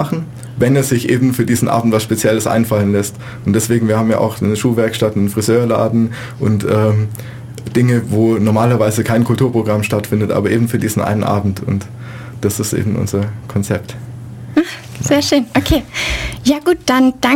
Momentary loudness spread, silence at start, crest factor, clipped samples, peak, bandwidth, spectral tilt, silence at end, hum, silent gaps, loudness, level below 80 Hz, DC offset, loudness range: 9 LU; 0 s; 14 dB; under 0.1%; -2 dBFS; 17 kHz; -6 dB/octave; 0 s; none; none; -15 LUFS; -38 dBFS; under 0.1%; 4 LU